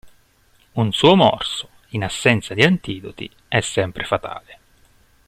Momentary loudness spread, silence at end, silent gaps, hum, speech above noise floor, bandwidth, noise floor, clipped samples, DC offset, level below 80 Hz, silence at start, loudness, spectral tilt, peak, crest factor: 17 LU; 0.75 s; none; none; 38 dB; 14.5 kHz; -57 dBFS; under 0.1%; under 0.1%; -50 dBFS; 0.05 s; -18 LUFS; -5 dB/octave; 0 dBFS; 20 dB